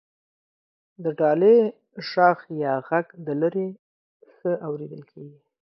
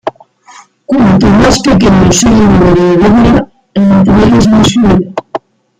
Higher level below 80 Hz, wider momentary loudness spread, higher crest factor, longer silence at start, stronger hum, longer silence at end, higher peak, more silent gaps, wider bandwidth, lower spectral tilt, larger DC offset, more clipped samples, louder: second, -78 dBFS vs -24 dBFS; first, 16 LU vs 12 LU; first, 20 dB vs 6 dB; first, 1 s vs 0.05 s; neither; about the same, 0.5 s vs 0.4 s; second, -6 dBFS vs 0 dBFS; first, 3.79-4.20 s vs none; second, 6 kHz vs 11.5 kHz; first, -8.5 dB/octave vs -6 dB/octave; neither; neither; second, -23 LUFS vs -6 LUFS